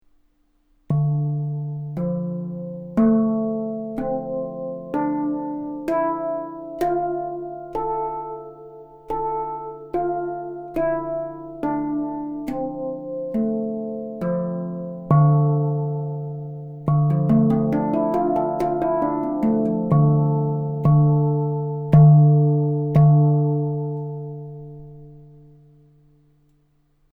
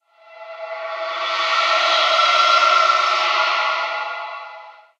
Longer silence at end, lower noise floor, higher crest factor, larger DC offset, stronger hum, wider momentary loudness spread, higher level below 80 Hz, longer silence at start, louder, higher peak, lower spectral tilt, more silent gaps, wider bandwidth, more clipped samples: first, 1.85 s vs 0.3 s; first, -62 dBFS vs -41 dBFS; about the same, 18 dB vs 16 dB; neither; neither; second, 14 LU vs 18 LU; first, -50 dBFS vs under -90 dBFS; first, 0.9 s vs 0.3 s; second, -22 LUFS vs -16 LUFS; about the same, -4 dBFS vs -4 dBFS; first, -11.5 dB/octave vs 2.5 dB/octave; neither; second, 2.7 kHz vs 9.6 kHz; neither